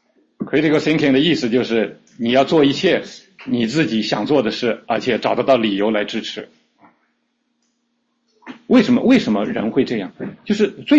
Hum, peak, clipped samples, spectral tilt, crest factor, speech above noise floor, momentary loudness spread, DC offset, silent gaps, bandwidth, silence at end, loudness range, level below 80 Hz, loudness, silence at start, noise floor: none; -2 dBFS; under 0.1%; -6 dB/octave; 16 dB; 52 dB; 12 LU; under 0.1%; none; 7.8 kHz; 0 s; 5 LU; -56 dBFS; -17 LUFS; 0.4 s; -69 dBFS